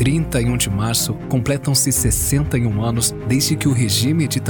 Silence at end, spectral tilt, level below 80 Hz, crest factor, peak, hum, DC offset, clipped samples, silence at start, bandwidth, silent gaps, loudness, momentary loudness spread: 0 s; -4.5 dB/octave; -32 dBFS; 12 dB; -6 dBFS; none; under 0.1%; under 0.1%; 0 s; 19 kHz; none; -17 LUFS; 4 LU